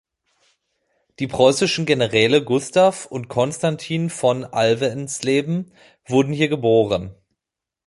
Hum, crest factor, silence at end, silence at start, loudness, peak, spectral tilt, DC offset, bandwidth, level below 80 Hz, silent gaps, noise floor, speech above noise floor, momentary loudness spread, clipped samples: none; 18 dB; 0.75 s; 1.2 s; -19 LUFS; -2 dBFS; -5 dB/octave; under 0.1%; 11.5 kHz; -54 dBFS; none; -86 dBFS; 67 dB; 10 LU; under 0.1%